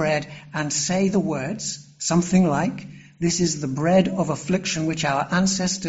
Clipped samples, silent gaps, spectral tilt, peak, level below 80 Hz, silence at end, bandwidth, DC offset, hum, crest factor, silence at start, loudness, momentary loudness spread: under 0.1%; none; -4.5 dB/octave; -6 dBFS; -52 dBFS; 0 s; 8 kHz; under 0.1%; none; 16 dB; 0 s; -22 LUFS; 9 LU